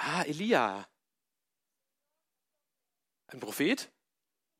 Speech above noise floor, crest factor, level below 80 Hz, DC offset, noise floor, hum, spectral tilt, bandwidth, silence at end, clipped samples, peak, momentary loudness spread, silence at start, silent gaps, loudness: 58 dB; 24 dB; -84 dBFS; under 0.1%; -89 dBFS; none; -4 dB/octave; 16 kHz; 0.75 s; under 0.1%; -12 dBFS; 18 LU; 0 s; none; -31 LUFS